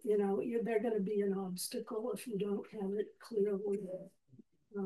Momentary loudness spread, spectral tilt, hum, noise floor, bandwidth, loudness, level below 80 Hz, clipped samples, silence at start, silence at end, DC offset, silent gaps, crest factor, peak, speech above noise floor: 6 LU; -6 dB/octave; none; -64 dBFS; 12.5 kHz; -37 LUFS; -82 dBFS; under 0.1%; 0.05 s; 0 s; under 0.1%; none; 14 dB; -22 dBFS; 27 dB